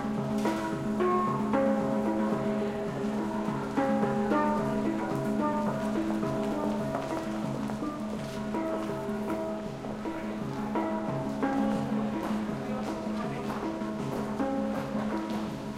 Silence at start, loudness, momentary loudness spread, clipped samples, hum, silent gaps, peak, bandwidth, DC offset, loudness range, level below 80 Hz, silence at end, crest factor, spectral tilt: 0 s; -31 LUFS; 7 LU; under 0.1%; none; none; -14 dBFS; 15 kHz; under 0.1%; 4 LU; -54 dBFS; 0 s; 16 dB; -7 dB/octave